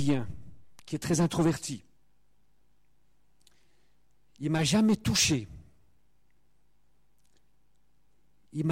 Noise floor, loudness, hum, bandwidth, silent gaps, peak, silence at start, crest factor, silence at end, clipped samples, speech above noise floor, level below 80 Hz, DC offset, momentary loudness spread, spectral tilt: -73 dBFS; -28 LUFS; 60 Hz at -60 dBFS; 16.5 kHz; none; -14 dBFS; 0 s; 18 dB; 0 s; under 0.1%; 46 dB; -56 dBFS; under 0.1%; 19 LU; -4.5 dB/octave